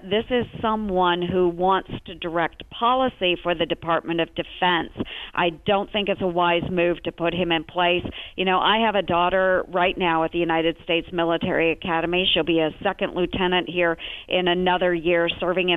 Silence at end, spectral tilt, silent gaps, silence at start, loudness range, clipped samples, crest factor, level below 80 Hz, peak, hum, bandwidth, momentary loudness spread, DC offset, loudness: 0 s; -7.5 dB/octave; none; 0 s; 2 LU; under 0.1%; 16 dB; -46 dBFS; -6 dBFS; none; 4 kHz; 6 LU; under 0.1%; -22 LUFS